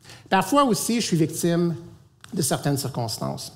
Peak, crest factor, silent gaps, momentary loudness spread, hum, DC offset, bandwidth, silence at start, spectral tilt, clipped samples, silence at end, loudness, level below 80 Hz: -6 dBFS; 18 dB; none; 9 LU; none; under 0.1%; 16 kHz; 0.05 s; -4.5 dB/octave; under 0.1%; 0 s; -23 LUFS; -58 dBFS